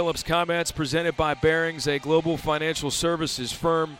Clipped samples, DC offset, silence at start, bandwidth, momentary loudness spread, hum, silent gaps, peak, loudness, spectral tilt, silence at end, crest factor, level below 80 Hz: under 0.1%; under 0.1%; 0 s; 16.5 kHz; 4 LU; none; none; -10 dBFS; -24 LUFS; -4 dB/octave; 0 s; 14 dB; -46 dBFS